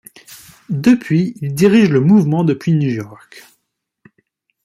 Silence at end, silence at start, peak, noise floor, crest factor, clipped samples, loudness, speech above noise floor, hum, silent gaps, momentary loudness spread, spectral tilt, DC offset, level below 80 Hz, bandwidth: 1.25 s; 0.3 s; -2 dBFS; -72 dBFS; 14 dB; under 0.1%; -14 LUFS; 58 dB; none; none; 11 LU; -7.5 dB/octave; under 0.1%; -56 dBFS; 15 kHz